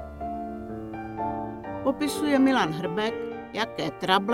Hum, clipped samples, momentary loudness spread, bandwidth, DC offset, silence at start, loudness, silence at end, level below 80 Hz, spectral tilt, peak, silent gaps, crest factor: none; under 0.1%; 14 LU; 16.5 kHz; under 0.1%; 0 s; -28 LUFS; 0 s; -52 dBFS; -5 dB/octave; -6 dBFS; none; 20 dB